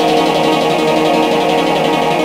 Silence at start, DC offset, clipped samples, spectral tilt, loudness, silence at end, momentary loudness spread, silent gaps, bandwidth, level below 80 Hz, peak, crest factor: 0 s; under 0.1%; under 0.1%; -4.5 dB/octave; -13 LUFS; 0 s; 1 LU; none; 16 kHz; -50 dBFS; -2 dBFS; 12 dB